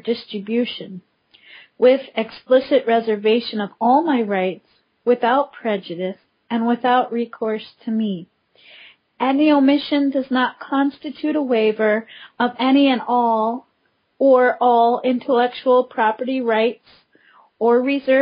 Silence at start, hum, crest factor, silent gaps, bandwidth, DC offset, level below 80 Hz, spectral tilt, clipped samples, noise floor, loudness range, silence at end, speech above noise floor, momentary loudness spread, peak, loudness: 0.05 s; none; 16 dB; none; 5.2 kHz; under 0.1%; -70 dBFS; -10 dB/octave; under 0.1%; -66 dBFS; 4 LU; 0 s; 48 dB; 11 LU; -4 dBFS; -19 LUFS